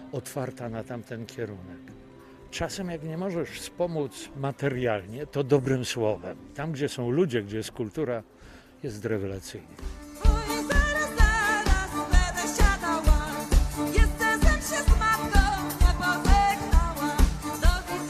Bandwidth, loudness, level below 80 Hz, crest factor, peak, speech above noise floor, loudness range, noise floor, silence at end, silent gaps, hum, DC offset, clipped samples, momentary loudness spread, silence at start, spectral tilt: 14.5 kHz; -27 LUFS; -28 dBFS; 20 dB; -6 dBFS; 18 dB; 9 LU; -49 dBFS; 0 s; none; none; under 0.1%; under 0.1%; 14 LU; 0 s; -5 dB/octave